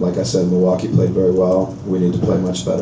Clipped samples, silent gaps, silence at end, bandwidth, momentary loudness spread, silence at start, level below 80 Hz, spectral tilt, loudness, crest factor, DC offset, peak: under 0.1%; none; 0 s; 8 kHz; 4 LU; 0 s; -40 dBFS; -7.5 dB/octave; -17 LUFS; 12 dB; under 0.1%; -4 dBFS